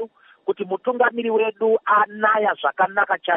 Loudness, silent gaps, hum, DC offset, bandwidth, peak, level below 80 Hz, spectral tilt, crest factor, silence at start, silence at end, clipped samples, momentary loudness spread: -20 LUFS; none; none; under 0.1%; 3.8 kHz; -6 dBFS; -82 dBFS; -1.5 dB/octave; 16 dB; 0 s; 0 s; under 0.1%; 9 LU